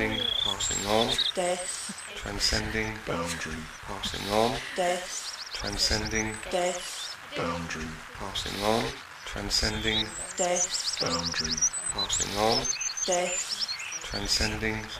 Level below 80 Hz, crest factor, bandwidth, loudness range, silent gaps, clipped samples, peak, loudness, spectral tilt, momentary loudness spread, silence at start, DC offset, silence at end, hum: -44 dBFS; 20 dB; 15.5 kHz; 4 LU; none; under 0.1%; -10 dBFS; -28 LUFS; -2 dB/octave; 10 LU; 0 s; under 0.1%; 0 s; none